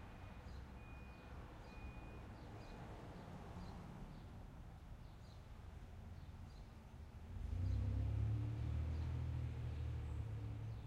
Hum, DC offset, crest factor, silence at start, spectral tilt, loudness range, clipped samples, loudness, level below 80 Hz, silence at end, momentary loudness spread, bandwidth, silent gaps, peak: none; under 0.1%; 16 dB; 0 s; -8 dB/octave; 12 LU; under 0.1%; -49 LUFS; -52 dBFS; 0 s; 15 LU; 10 kHz; none; -30 dBFS